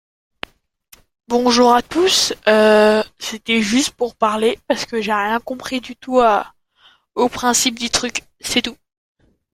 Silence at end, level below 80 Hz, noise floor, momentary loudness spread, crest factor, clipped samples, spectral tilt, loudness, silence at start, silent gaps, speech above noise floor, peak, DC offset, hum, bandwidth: 0.8 s; -50 dBFS; -54 dBFS; 14 LU; 18 dB; under 0.1%; -2.5 dB/octave; -17 LUFS; 1.3 s; none; 37 dB; 0 dBFS; under 0.1%; none; 16.5 kHz